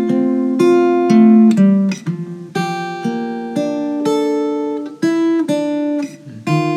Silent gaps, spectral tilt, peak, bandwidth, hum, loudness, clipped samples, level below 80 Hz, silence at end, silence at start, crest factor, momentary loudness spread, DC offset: none; -7 dB/octave; 0 dBFS; 11.5 kHz; none; -15 LUFS; under 0.1%; -82 dBFS; 0 s; 0 s; 14 dB; 13 LU; under 0.1%